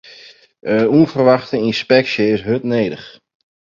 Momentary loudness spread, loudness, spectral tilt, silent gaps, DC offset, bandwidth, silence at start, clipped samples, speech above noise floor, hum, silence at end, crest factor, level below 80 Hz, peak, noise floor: 8 LU; -15 LUFS; -7 dB/octave; none; under 0.1%; 7.4 kHz; 0.65 s; under 0.1%; 28 dB; none; 0.65 s; 16 dB; -54 dBFS; 0 dBFS; -43 dBFS